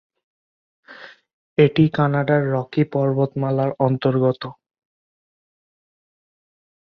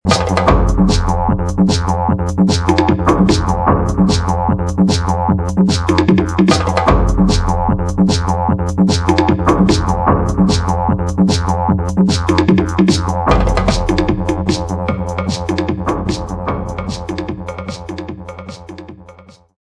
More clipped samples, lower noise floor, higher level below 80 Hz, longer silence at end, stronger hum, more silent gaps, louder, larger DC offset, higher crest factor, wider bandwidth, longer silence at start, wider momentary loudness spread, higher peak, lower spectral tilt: neither; about the same, -43 dBFS vs -41 dBFS; second, -60 dBFS vs -22 dBFS; first, 2.3 s vs 0.4 s; neither; first, 1.33-1.56 s vs none; second, -20 LUFS vs -14 LUFS; neither; first, 20 dB vs 14 dB; second, 5.4 kHz vs 11 kHz; first, 0.9 s vs 0.05 s; second, 5 LU vs 10 LU; about the same, -2 dBFS vs 0 dBFS; first, -10 dB/octave vs -6 dB/octave